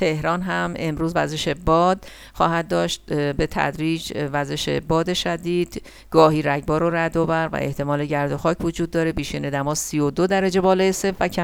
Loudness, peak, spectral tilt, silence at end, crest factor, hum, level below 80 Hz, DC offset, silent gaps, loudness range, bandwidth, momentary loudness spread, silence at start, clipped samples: -21 LUFS; 0 dBFS; -5 dB/octave; 0 s; 20 dB; none; -40 dBFS; under 0.1%; none; 2 LU; 17.5 kHz; 7 LU; 0 s; under 0.1%